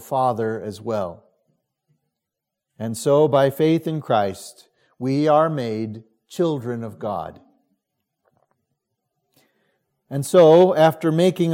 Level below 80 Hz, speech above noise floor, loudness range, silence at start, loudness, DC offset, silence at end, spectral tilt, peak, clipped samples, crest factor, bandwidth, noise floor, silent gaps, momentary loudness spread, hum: -68 dBFS; 65 dB; 12 LU; 0 s; -19 LUFS; under 0.1%; 0 s; -6.5 dB/octave; -2 dBFS; under 0.1%; 18 dB; 16.5 kHz; -83 dBFS; none; 18 LU; none